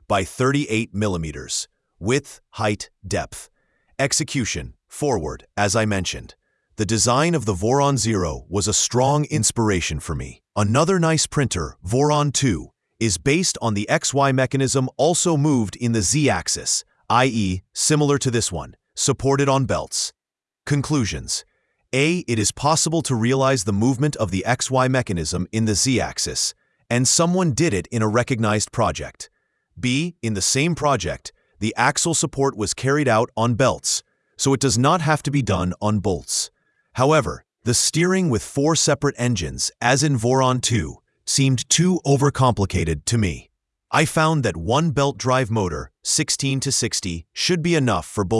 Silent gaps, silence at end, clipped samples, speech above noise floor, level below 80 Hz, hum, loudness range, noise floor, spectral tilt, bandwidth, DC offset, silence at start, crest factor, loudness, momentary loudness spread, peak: none; 0 s; under 0.1%; 69 dB; -44 dBFS; none; 3 LU; -89 dBFS; -4 dB/octave; 12 kHz; under 0.1%; 0.1 s; 20 dB; -20 LUFS; 9 LU; -2 dBFS